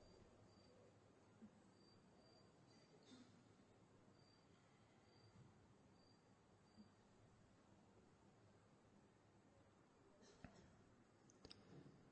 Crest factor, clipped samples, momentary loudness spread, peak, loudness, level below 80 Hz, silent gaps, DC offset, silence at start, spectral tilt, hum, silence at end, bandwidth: 28 dB; under 0.1%; 4 LU; -42 dBFS; -67 LUFS; -84 dBFS; none; under 0.1%; 0 s; -5 dB/octave; none; 0 s; 8.2 kHz